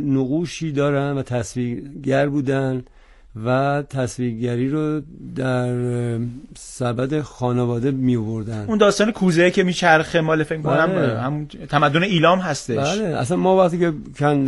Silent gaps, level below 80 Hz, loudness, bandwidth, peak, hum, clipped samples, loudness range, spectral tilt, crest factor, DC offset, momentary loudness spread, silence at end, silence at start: none; -48 dBFS; -20 LUFS; 11.5 kHz; 0 dBFS; none; under 0.1%; 6 LU; -6 dB/octave; 18 dB; under 0.1%; 10 LU; 0 s; 0 s